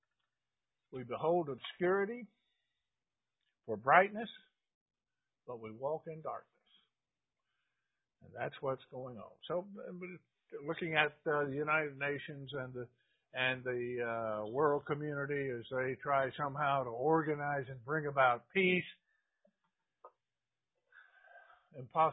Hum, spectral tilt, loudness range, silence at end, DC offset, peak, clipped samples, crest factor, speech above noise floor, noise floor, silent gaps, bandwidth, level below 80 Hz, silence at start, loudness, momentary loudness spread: none; -1 dB/octave; 12 LU; 0 s; under 0.1%; -10 dBFS; under 0.1%; 28 dB; over 54 dB; under -90 dBFS; 4.75-4.86 s; 3.9 kHz; -78 dBFS; 0.9 s; -36 LUFS; 18 LU